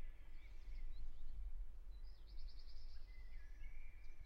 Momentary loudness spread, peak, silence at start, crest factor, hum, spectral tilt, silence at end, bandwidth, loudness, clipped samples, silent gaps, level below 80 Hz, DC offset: 5 LU; -36 dBFS; 0 s; 10 dB; none; -5.5 dB/octave; 0 s; 5.6 kHz; -59 LUFS; under 0.1%; none; -50 dBFS; under 0.1%